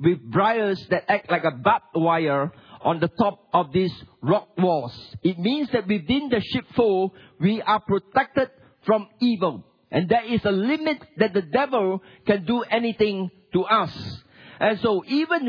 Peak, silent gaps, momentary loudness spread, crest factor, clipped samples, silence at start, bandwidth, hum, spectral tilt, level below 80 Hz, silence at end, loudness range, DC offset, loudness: -4 dBFS; none; 7 LU; 18 dB; under 0.1%; 0 s; 5.4 kHz; none; -8.5 dB/octave; -58 dBFS; 0 s; 1 LU; under 0.1%; -23 LUFS